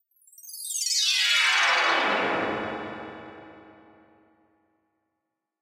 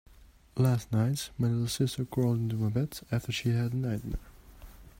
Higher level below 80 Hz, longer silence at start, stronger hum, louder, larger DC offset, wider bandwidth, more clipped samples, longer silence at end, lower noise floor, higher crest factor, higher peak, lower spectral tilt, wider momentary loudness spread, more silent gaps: second, -68 dBFS vs -50 dBFS; first, 0.4 s vs 0.2 s; neither; first, -22 LUFS vs -31 LUFS; neither; about the same, 16 kHz vs 16 kHz; neither; first, 1.9 s vs 0.1 s; first, -83 dBFS vs -54 dBFS; about the same, 18 dB vs 16 dB; first, -10 dBFS vs -14 dBFS; second, 0 dB/octave vs -6.5 dB/octave; first, 22 LU vs 7 LU; neither